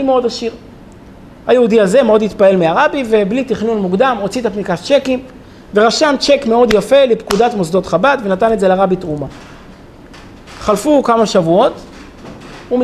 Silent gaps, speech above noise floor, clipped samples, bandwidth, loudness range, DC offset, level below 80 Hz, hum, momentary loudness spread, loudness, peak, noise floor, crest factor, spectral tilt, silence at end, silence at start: none; 25 dB; under 0.1%; 13.5 kHz; 4 LU; under 0.1%; -42 dBFS; none; 12 LU; -13 LUFS; 0 dBFS; -37 dBFS; 14 dB; -5 dB/octave; 0 s; 0 s